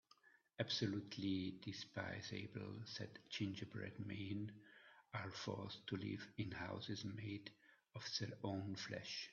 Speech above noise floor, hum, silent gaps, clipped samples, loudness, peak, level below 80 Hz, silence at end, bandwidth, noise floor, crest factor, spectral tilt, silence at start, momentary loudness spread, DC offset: 25 dB; none; none; under 0.1%; -48 LUFS; -28 dBFS; -80 dBFS; 0 s; 7.2 kHz; -73 dBFS; 22 dB; -4.5 dB/octave; 0.25 s; 9 LU; under 0.1%